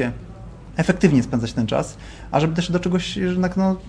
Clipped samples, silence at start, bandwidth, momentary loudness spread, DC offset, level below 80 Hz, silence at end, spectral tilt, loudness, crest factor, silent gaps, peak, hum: under 0.1%; 0 s; 10.5 kHz; 17 LU; under 0.1%; -40 dBFS; 0 s; -6.5 dB/octave; -21 LUFS; 18 dB; none; -2 dBFS; none